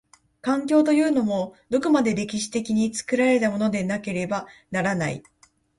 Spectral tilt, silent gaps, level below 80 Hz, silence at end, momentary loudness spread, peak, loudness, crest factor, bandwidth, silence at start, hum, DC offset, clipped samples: -5.5 dB/octave; none; -60 dBFS; 0.6 s; 9 LU; -6 dBFS; -23 LUFS; 16 dB; 11.5 kHz; 0.45 s; none; under 0.1%; under 0.1%